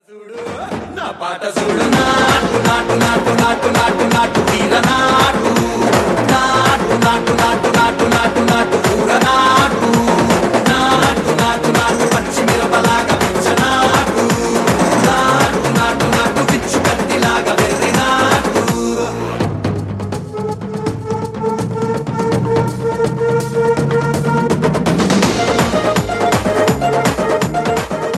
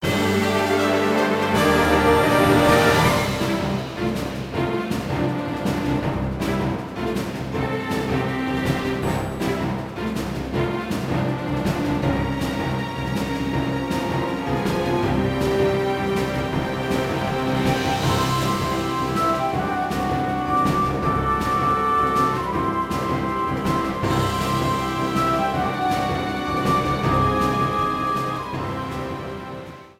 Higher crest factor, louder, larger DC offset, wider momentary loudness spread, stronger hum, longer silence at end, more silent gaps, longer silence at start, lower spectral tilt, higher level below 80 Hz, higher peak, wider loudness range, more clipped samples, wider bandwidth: about the same, 14 dB vs 18 dB; first, -14 LUFS vs -22 LUFS; neither; about the same, 8 LU vs 8 LU; neither; about the same, 0 s vs 0.1 s; neither; about the same, 0.1 s vs 0 s; second, -4.5 dB/octave vs -6 dB/octave; about the same, -36 dBFS vs -38 dBFS; about the same, 0 dBFS vs -2 dBFS; about the same, 5 LU vs 6 LU; neither; about the same, 15.5 kHz vs 16.5 kHz